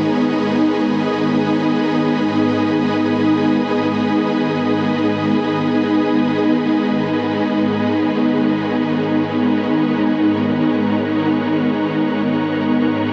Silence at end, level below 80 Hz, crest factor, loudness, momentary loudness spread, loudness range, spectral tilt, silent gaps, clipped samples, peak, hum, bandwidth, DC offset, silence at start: 0 s; -60 dBFS; 12 dB; -17 LUFS; 2 LU; 1 LU; -7.5 dB/octave; none; under 0.1%; -6 dBFS; none; 6.8 kHz; under 0.1%; 0 s